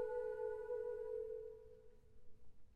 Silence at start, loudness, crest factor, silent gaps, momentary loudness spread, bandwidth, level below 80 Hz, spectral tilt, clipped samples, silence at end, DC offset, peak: 0 s; -46 LUFS; 14 dB; none; 17 LU; 8.6 kHz; -68 dBFS; -6.5 dB/octave; under 0.1%; 0 s; under 0.1%; -32 dBFS